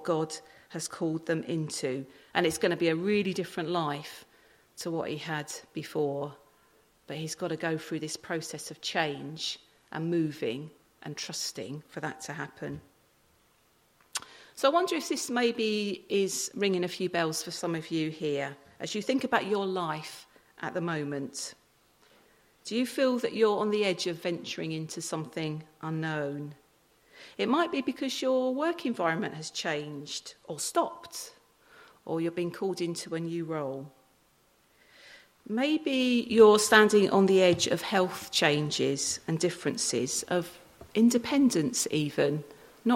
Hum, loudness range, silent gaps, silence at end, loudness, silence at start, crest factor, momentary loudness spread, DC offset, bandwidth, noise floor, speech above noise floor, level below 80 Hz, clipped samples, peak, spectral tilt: none; 12 LU; none; 0 s; -29 LUFS; 0 s; 24 dB; 14 LU; under 0.1%; 16.5 kHz; -66 dBFS; 37 dB; -72 dBFS; under 0.1%; -6 dBFS; -4 dB/octave